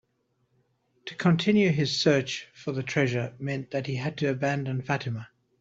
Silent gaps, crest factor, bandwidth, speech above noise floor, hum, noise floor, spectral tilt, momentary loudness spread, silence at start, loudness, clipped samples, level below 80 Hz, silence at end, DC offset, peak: none; 20 dB; 7.8 kHz; 46 dB; none; -73 dBFS; -6 dB/octave; 12 LU; 1.05 s; -27 LUFS; under 0.1%; -64 dBFS; 0.35 s; under 0.1%; -8 dBFS